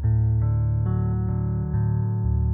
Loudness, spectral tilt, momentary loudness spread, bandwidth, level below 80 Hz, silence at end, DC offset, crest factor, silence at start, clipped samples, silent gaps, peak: -24 LUFS; -15 dB/octave; 4 LU; 2 kHz; -30 dBFS; 0 s; under 0.1%; 8 dB; 0 s; under 0.1%; none; -14 dBFS